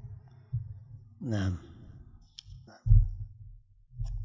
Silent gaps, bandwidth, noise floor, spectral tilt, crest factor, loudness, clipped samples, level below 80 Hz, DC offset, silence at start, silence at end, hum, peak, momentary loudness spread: none; 7.4 kHz; -53 dBFS; -8 dB/octave; 22 dB; -32 LUFS; under 0.1%; -34 dBFS; under 0.1%; 0.05 s; 0 s; none; -8 dBFS; 26 LU